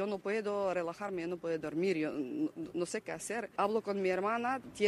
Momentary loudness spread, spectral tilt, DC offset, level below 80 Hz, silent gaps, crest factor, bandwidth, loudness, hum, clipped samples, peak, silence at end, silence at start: 6 LU; -5 dB/octave; under 0.1%; -74 dBFS; none; 18 dB; 14 kHz; -36 LUFS; none; under 0.1%; -16 dBFS; 0 s; 0 s